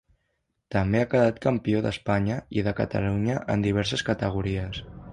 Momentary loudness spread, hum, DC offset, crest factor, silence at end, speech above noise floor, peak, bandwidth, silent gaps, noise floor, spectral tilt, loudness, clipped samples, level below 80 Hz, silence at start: 7 LU; none; under 0.1%; 18 dB; 0 s; 51 dB; -8 dBFS; 10.5 kHz; none; -76 dBFS; -7 dB/octave; -26 LUFS; under 0.1%; -44 dBFS; 0.7 s